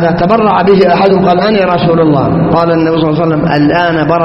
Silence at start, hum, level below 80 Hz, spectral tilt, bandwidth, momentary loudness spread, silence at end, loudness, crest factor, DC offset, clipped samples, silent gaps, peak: 0 s; none; -36 dBFS; -9 dB/octave; 6 kHz; 3 LU; 0 s; -9 LUFS; 8 dB; under 0.1%; 0.2%; none; 0 dBFS